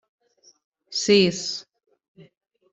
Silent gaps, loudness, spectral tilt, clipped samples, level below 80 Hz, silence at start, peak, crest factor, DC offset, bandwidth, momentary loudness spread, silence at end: 2.08-2.15 s; -22 LUFS; -4 dB/octave; under 0.1%; -66 dBFS; 0.9 s; -4 dBFS; 22 dB; under 0.1%; 8.2 kHz; 13 LU; 0.5 s